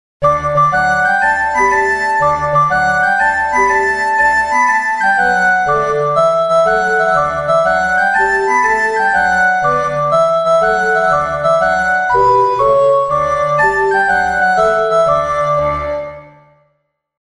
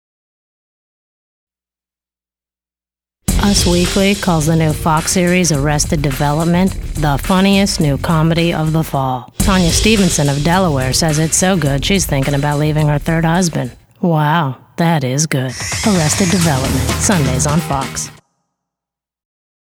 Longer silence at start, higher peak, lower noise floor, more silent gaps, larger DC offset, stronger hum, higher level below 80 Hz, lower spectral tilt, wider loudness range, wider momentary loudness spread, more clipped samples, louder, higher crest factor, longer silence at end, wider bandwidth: second, 0.2 s vs 3.3 s; about the same, -2 dBFS vs 0 dBFS; second, -65 dBFS vs under -90 dBFS; neither; first, 0.2% vs under 0.1%; neither; second, -40 dBFS vs -28 dBFS; about the same, -4.5 dB/octave vs -4.5 dB/octave; about the same, 1 LU vs 3 LU; second, 3 LU vs 6 LU; neither; about the same, -12 LUFS vs -14 LUFS; about the same, 12 dB vs 14 dB; second, 0.95 s vs 1.5 s; second, 11.5 kHz vs 19 kHz